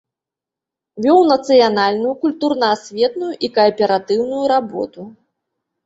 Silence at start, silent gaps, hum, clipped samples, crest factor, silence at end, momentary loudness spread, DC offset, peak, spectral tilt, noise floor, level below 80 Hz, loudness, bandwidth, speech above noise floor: 0.95 s; none; none; under 0.1%; 16 dB; 0.75 s; 10 LU; under 0.1%; 0 dBFS; -5 dB/octave; -86 dBFS; -62 dBFS; -16 LUFS; 8 kHz; 71 dB